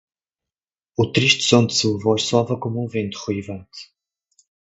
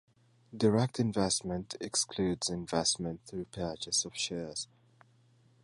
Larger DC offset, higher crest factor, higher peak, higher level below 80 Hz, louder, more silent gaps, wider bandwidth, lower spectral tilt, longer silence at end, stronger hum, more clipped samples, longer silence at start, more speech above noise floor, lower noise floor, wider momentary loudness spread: neither; about the same, 22 dB vs 20 dB; first, 0 dBFS vs -14 dBFS; first, -54 dBFS vs -60 dBFS; first, -19 LUFS vs -33 LUFS; neither; second, 8.2 kHz vs 11.5 kHz; about the same, -4.5 dB/octave vs -4 dB/octave; second, 0.85 s vs 1 s; neither; neither; first, 1 s vs 0.5 s; first, over 70 dB vs 32 dB; first, under -90 dBFS vs -65 dBFS; first, 18 LU vs 11 LU